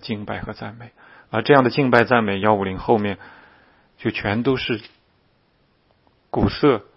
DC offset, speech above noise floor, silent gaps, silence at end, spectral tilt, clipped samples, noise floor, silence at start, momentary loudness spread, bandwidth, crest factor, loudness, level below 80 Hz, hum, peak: under 0.1%; 42 dB; none; 0.15 s; -8.5 dB/octave; under 0.1%; -62 dBFS; 0 s; 14 LU; 6.2 kHz; 22 dB; -20 LUFS; -46 dBFS; none; 0 dBFS